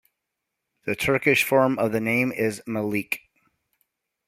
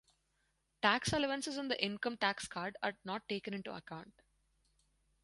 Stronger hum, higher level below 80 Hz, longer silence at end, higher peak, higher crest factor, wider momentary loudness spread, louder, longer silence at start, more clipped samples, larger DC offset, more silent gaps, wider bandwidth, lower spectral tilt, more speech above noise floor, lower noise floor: neither; first, -60 dBFS vs -68 dBFS; about the same, 1.1 s vs 1.15 s; first, -4 dBFS vs -14 dBFS; about the same, 20 dB vs 24 dB; about the same, 12 LU vs 13 LU; first, -23 LUFS vs -37 LUFS; about the same, 0.85 s vs 0.85 s; neither; neither; neither; first, 16 kHz vs 11.5 kHz; first, -5 dB/octave vs -3.5 dB/octave; first, 59 dB vs 42 dB; about the same, -82 dBFS vs -80 dBFS